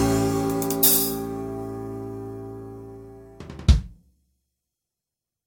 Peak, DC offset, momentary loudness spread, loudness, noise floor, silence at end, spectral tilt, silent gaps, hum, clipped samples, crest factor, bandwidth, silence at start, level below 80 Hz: -4 dBFS; under 0.1%; 24 LU; -22 LUFS; -87 dBFS; 1.55 s; -4.5 dB/octave; none; none; under 0.1%; 22 dB; 19.5 kHz; 0 s; -32 dBFS